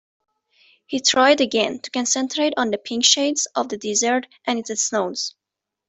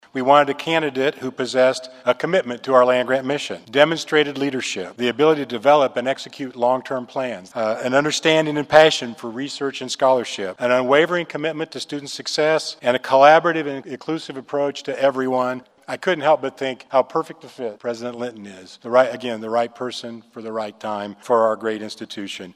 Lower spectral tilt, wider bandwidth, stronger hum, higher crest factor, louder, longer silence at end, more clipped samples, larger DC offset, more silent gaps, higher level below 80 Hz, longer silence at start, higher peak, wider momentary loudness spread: second, -1 dB/octave vs -4 dB/octave; second, 8.4 kHz vs 13 kHz; neither; about the same, 20 dB vs 20 dB; about the same, -20 LUFS vs -20 LUFS; first, 0.6 s vs 0.05 s; neither; neither; neither; about the same, -68 dBFS vs -66 dBFS; first, 0.9 s vs 0.15 s; about the same, -2 dBFS vs 0 dBFS; second, 10 LU vs 14 LU